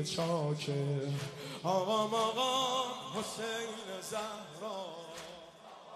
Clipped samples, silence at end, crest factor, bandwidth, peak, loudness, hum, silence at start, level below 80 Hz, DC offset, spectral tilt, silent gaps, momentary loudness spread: under 0.1%; 0 s; 18 dB; 13 kHz; -18 dBFS; -35 LUFS; none; 0 s; -74 dBFS; under 0.1%; -4.5 dB/octave; none; 15 LU